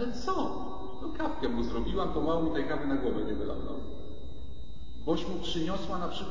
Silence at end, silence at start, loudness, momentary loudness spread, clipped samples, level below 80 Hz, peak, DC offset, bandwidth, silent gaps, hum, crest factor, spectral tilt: 0 s; 0 s; -33 LUFS; 16 LU; under 0.1%; -44 dBFS; -16 dBFS; 3%; 7.6 kHz; none; none; 16 dB; -6.5 dB/octave